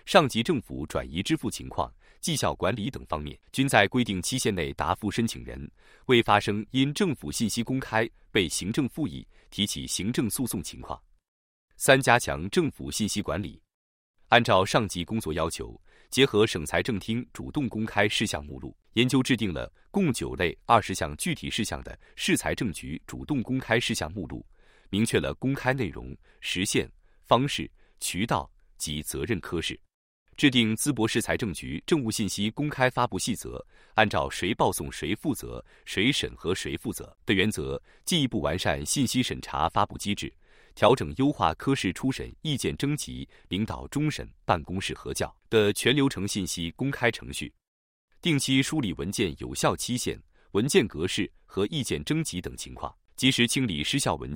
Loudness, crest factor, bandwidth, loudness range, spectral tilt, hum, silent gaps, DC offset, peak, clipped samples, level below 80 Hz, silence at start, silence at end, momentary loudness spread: -27 LUFS; 26 dB; 16.5 kHz; 3 LU; -4 dB/octave; none; 11.28-11.68 s, 13.74-14.14 s, 29.94-30.26 s, 47.67-48.08 s; under 0.1%; -2 dBFS; under 0.1%; -50 dBFS; 0.05 s; 0 s; 13 LU